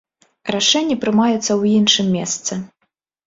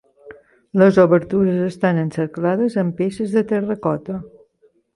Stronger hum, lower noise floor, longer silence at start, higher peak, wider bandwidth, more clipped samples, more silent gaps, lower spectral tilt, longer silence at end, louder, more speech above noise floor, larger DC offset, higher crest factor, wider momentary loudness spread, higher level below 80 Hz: neither; first, -70 dBFS vs -59 dBFS; first, 0.45 s vs 0.25 s; about the same, -2 dBFS vs -2 dBFS; second, 7.8 kHz vs 11 kHz; neither; neither; second, -3.5 dB/octave vs -8.5 dB/octave; about the same, 0.6 s vs 0.65 s; about the same, -16 LUFS vs -18 LUFS; first, 54 dB vs 41 dB; neither; about the same, 18 dB vs 16 dB; about the same, 11 LU vs 10 LU; about the same, -60 dBFS vs -56 dBFS